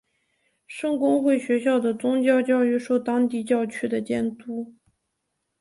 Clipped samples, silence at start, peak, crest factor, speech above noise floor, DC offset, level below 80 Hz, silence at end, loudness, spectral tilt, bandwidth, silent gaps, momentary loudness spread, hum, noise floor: under 0.1%; 0.7 s; -8 dBFS; 16 dB; 56 dB; under 0.1%; -66 dBFS; 0.9 s; -23 LUFS; -5.5 dB/octave; 11.5 kHz; none; 13 LU; none; -78 dBFS